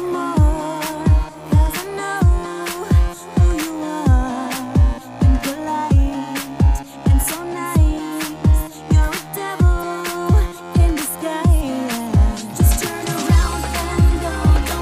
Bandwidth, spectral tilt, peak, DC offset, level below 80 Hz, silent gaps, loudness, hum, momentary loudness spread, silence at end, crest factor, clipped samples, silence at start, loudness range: 16 kHz; -6 dB/octave; -4 dBFS; under 0.1%; -20 dBFS; none; -19 LUFS; none; 7 LU; 0 s; 12 dB; under 0.1%; 0 s; 1 LU